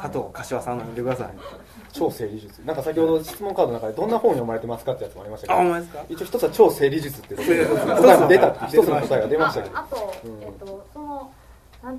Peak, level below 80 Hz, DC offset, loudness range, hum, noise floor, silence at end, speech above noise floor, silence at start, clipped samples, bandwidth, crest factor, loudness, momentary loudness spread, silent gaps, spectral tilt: 0 dBFS; -50 dBFS; under 0.1%; 8 LU; none; -41 dBFS; 0 s; 19 dB; 0 s; under 0.1%; 14 kHz; 22 dB; -21 LUFS; 20 LU; none; -6 dB/octave